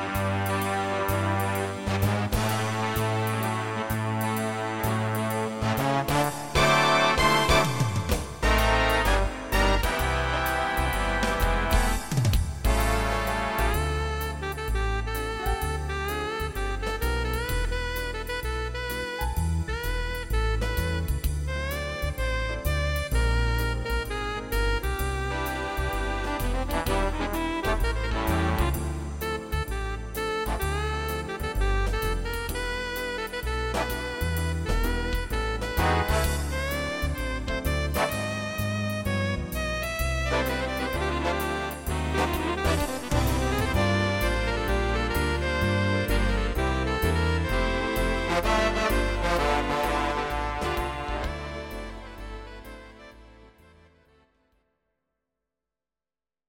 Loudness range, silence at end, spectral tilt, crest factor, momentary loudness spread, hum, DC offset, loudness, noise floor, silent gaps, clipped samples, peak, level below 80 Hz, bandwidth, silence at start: 6 LU; 3 s; -5 dB/octave; 18 dB; 7 LU; none; under 0.1%; -27 LUFS; under -90 dBFS; none; under 0.1%; -8 dBFS; -32 dBFS; 17 kHz; 0 s